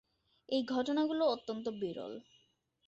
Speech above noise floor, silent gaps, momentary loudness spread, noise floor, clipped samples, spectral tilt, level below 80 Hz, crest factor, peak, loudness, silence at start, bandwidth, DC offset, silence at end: 40 dB; none; 13 LU; -75 dBFS; under 0.1%; -3.5 dB/octave; -78 dBFS; 16 dB; -20 dBFS; -35 LUFS; 0.5 s; 8 kHz; under 0.1%; 0.65 s